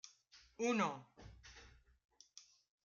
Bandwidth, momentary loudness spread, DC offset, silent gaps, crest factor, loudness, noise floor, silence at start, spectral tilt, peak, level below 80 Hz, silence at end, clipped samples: 7.6 kHz; 24 LU; under 0.1%; none; 22 dB; -40 LUFS; -68 dBFS; 0.05 s; -4.5 dB/octave; -22 dBFS; -70 dBFS; 0.45 s; under 0.1%